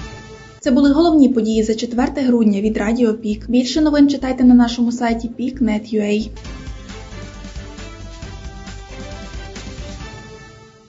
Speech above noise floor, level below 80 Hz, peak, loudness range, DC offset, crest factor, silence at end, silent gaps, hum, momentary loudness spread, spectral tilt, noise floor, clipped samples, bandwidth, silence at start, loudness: 26 dB; -36 dBFS; 0 dBFS; 18 LU; under 0.1%; 18 dB; 0.25 s; none; none; 21 LU; -6 dB/octave; -41 dBFS; under 0.1%; 7.8 kHz; 0 s; -16 LUFS